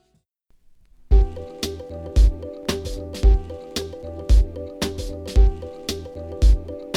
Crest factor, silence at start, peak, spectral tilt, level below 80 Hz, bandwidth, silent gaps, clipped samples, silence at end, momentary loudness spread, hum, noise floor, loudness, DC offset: 16 dB; 1.1 s; -4 dBFS; -6 dB/octave; -20 dBFS; 13 kHz; none; under 0.1%; 0 s; 11 LU; none; -66 dBFS; -24 LUFS; under 0.1%